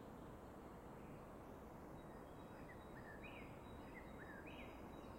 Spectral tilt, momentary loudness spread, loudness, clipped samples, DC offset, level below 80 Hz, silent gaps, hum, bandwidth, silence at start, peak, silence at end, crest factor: -6.5 dB/octave; 2 LU; -57 LUFS; under 0.1%; under 0.1%; -66 dBFS; none; none; 16 kHz; 0 s; -42 dBFS; 0 s; 14 dB